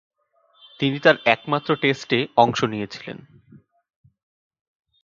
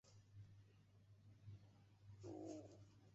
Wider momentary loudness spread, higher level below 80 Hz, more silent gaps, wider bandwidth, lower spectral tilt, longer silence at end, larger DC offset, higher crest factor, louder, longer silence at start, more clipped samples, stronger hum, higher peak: about the same, 16 LU vs 14 LU; first, -64 dBFS vs -80 dBFS; neither; about the same, 7.6 kHz vs 7.6 kHz; second, -5.5 dB/octave vs -8 dB/octave; first, 1.85 s vs 0 s; neither; about the same, 24 dB vs 20 dB; first, -20 LUFS vs -61 LUFS; first, 0.8 s vs 0.05 s; neither; neither; first, 0 dBFS vs -42 dBFS